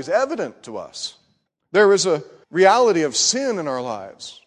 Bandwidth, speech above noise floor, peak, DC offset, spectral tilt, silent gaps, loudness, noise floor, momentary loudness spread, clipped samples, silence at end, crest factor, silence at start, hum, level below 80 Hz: 10.5 kHz; 48 dB; -2 dBFS; under 0.1%; -2.5 dB/octave; none; -18 LUFS; -67 dBFS; 17 LU; under 0.1%; 0.15 s; 18 dB; 0 s; none; -66 dBFS